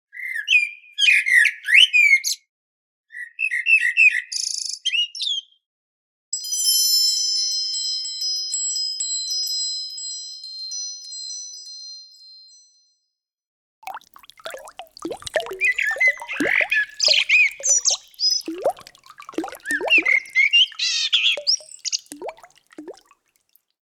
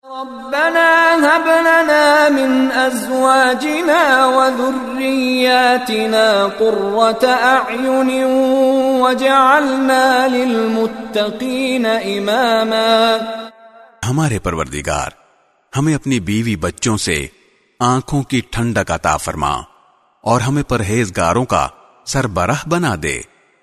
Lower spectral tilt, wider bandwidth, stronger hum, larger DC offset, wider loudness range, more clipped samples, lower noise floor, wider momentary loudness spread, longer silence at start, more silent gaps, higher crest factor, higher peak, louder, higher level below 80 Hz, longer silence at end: second, 2.5 dB/octave vs -4.5 dB/octave; first, 19.5 kHz vs 13.5 kHz; neither; neither; first, 17 LU vs 7 LU; neither; first, -78 dBFS vs -55 dBFS; first, 21 LU vs 10 LU; about the same, 0.15 s vs 0.05 s; first, 2.49-3.04 s, 5.66-6.32 s, 13.47-13.82 s vs none; first, 20 dB vs 14 dB; about the same, -2 dBFS vs 0 dBFS; second, -18 LUFS vs -14 LUFS; second, -68 dBFS vs -40 dBFS; first, 0.9 s vs 0.4 s